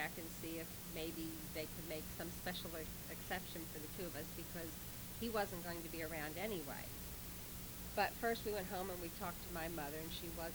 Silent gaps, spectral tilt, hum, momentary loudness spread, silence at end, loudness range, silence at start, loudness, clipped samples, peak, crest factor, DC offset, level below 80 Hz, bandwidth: none; -4 dB/octave; none; 7 LU; 0 s; 3 LU; 0 s; -45 LUFS; under 0.1%; -24 dBFS; 22 dB; under 0.1%; -58 dBFS; over 20 kHz